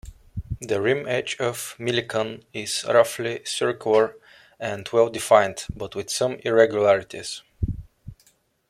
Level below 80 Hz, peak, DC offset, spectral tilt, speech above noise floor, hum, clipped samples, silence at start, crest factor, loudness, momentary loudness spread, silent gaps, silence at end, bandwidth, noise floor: -46 dBFS; -2 dBFS; under 0.1%; -4 dB/octave; 39 dB; none; under 0.1%; 0.05 s; 20 dB; -23 LUFS; 14 LU; none; 0.55 s; 16 kHz; -62 dBFS